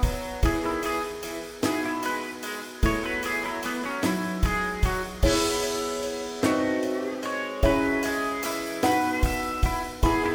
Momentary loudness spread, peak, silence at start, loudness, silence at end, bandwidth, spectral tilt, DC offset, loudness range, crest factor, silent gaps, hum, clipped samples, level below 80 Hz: 6 LU; -8 dBFS; 0 s; -27 LUFS; 0 s; over 20 kHz; -4.5 dB/octave; under 0.1%; 3 LU; 18 dB; none; none; under 0.1%; -32 dBFS